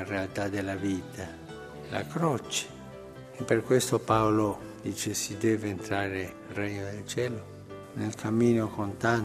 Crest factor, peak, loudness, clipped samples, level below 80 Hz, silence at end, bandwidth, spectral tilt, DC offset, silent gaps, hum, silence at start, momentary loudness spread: 20 dB; -10 dBFS; -30 LUFS; under 0.1%; -60 dBFS; 0 s; 15 kHz; -5 dB/octave; under 0.1%; none; none; 0 s; 17 LU